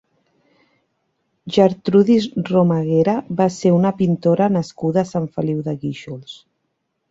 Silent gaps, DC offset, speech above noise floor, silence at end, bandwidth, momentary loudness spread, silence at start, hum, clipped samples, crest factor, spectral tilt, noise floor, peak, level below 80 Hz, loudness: none; under 0.1%; 55 dB; 0.75 s; 8 kHz; 12 LU; 1.45 s; none; under 0.1%; 16 dB; -7.5 dB/octave; -72 dBFS; -2 dBFS; -58 dBFS; -18 LUFS